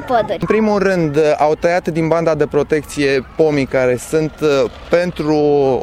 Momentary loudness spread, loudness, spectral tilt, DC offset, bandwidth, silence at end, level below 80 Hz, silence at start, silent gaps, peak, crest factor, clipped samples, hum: 3 LU; -15 LUFS; -6 dB/octave; under 0.1%; 14.5 kHz; 0 s; -40 dBFS; 0 s; none; 0 dBFS; 14 dB; under 0.1%; none